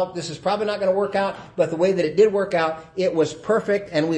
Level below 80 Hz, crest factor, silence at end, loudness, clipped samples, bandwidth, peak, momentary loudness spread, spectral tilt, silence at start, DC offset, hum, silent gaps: -60 dBFS; 16 dB; 0 s; -22 LUFS; under 0.1%; 9.2 kHz; -6 dBFS; 7 LU; -5.5 dB/octave; 0 s; under 0.1%; none; none